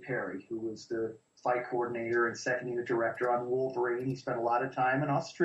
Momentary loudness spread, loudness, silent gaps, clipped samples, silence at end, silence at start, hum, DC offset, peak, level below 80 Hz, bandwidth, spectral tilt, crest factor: 8 LU; -33 LUFS; none; under 0.1%; 0 s; 0 s; none; under 0.1%; -16 dBFS; -74 dBFS; 8.2 kHz; -6 dB/octave; 16 dB